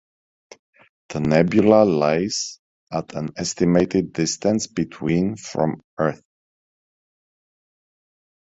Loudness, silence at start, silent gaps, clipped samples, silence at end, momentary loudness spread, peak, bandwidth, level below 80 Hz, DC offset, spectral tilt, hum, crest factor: -21 LUFS; 1.1 s; 2.59-2.87 s, 5.84-5.97 s; under 0.1%; 2.3 s; 14 LU; -2 dBFS; 8.2 kHz; -52 dBFS; under 0.1%; -5.5 dB/octave; none; 20 dB